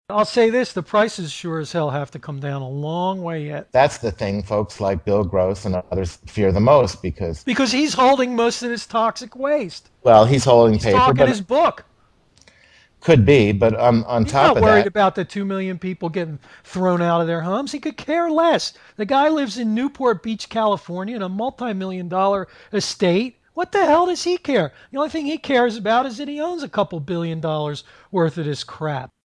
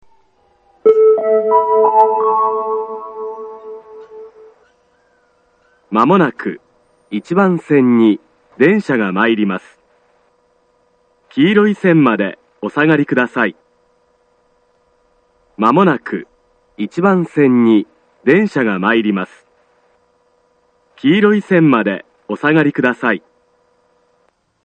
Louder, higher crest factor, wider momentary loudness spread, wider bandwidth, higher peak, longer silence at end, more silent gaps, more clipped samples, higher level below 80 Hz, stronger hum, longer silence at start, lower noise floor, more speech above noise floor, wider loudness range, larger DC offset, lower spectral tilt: second, -19 LUFS vs -14 LUFS; about the same, 18 dB vs 16 dB; about the same, 13 LU vs 15 LU; first, 10.5 kHz vs 8.8 kHz; about the same, 0 dBFS vs 0 dBFS; second, 0.2 s vs 1.45 s; neither; neither; first, -44 dBFS vs -64 dBFS; neither; second, 0.1 s vs 0.85 s; about the same, -58 dBFS vs -60 dBFS; second, 39 dB vs 47 dB; about the same, 6 LU vs 5 LU; neither; second, -6 dB/octave vs -8 dB/octave